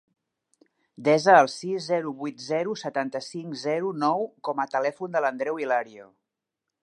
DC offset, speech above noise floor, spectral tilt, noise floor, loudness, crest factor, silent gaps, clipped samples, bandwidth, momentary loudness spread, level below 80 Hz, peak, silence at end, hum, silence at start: under 0.1%; 61 dB; -5 dB/octave; -86 dBFS; -25 LUFS; 24 dB; none; under 0.1%; 11 kHz; 14 LU; -82 dBFS; -2 dBFS; 0.8 s; none; 1 s